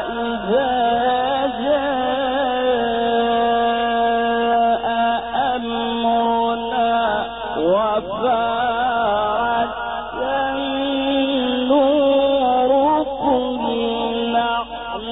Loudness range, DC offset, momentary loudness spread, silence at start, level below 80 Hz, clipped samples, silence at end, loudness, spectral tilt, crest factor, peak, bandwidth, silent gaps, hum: 2 LU; 0.2%; 6 LU; 0 s; -46 dBFS; under 0.1%; 0 s; -19 LUFS; -2 dB/octave; 12 dB; -6 dBFS; 4 kHz; none; none